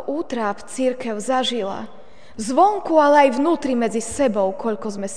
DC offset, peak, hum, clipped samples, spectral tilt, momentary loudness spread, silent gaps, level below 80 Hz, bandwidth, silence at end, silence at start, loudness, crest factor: 2%; -2 dBFS; none; under 0.1%; -4 dB/octave; 12 LU; none; -56 dBFS; 10 kHz; 0 s; 0 s; -20 LUFS; 18 dB